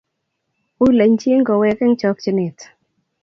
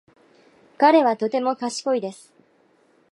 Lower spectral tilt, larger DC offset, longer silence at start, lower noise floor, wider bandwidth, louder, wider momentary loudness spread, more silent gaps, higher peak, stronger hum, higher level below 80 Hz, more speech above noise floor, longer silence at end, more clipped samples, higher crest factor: first, -7 dB/octave vs -4 dB/octave; neither; about the same, 0.8 s vs 0.8 s; first, -74 dBFS vs -60 dBFS; second, 7 kHz vs 11.5 kHz; first, -16 LUFS vs -20 LUFS; second, 7 LU vs 10 LU; neither; about the same, -2 dBFS vs -2 dBFS; neither; first, -52 dBFS vs -82 dBFS; first, 59 dB vs 40 dB; second, 0.6 s vs 1 s; neither; second, 14 dB vs 20 dB